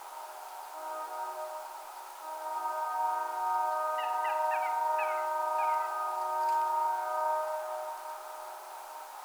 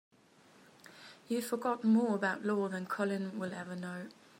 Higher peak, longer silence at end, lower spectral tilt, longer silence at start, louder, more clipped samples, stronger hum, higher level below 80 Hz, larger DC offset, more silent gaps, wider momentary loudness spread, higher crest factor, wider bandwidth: about the same, -20 dBFS vs -20 dBFS; second, 0 s vs 0.3 s; second, 1 dB/octave vs -6 dB/octave; second, 0 s vs 0.85 s; about the same, -33 LUFS vs -34 LUFS; neither; first, 60 Hz at -90 dBFS vs none; about the same, -88 dBFS vs -86 dBFS; neither; neither; about the same, 14 LU vs 16 LU; about the same, 14 dB vs 16 dB; first, over 20 kHz vs 16 kHz